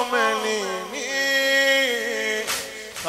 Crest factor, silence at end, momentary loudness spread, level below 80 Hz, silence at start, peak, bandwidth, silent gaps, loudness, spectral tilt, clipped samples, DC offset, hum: 14 dB; 0 s; 10 LU; -62 dBFS; 0 s; -8 dBFS; 16 kHz; none; -21 LUFS; -0.5 dB/octave; under 0.1%; under 0.1%; none